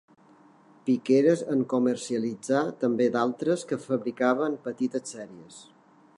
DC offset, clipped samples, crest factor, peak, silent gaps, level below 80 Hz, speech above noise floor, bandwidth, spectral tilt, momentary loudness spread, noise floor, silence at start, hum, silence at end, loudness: under 0.1%; under 0.1%; 18 dB; -10 dBFS; none; -80 dBFS; 30 dB; 11 kHz; -6 dB/octave; 12 LU; -56 dBFS; 0.85 s; none; 0.55 s; -26 LUFS